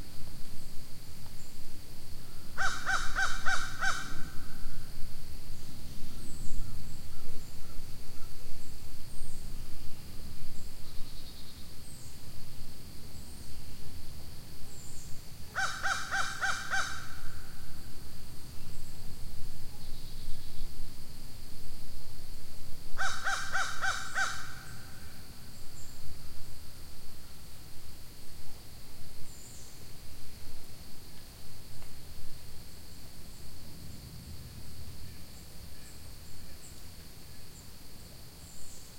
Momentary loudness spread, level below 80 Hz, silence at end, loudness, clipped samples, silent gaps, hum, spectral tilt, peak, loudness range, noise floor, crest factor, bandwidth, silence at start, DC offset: 17 LU; -42 dBFS; 0.05 s; -41 LUFS; under 0.1%; none; none; -2.5 dB/octave; -10 dBFS; 14 LU; -48 dBFS; 16 dB; 16.5 kHz; 0 s; 0.5%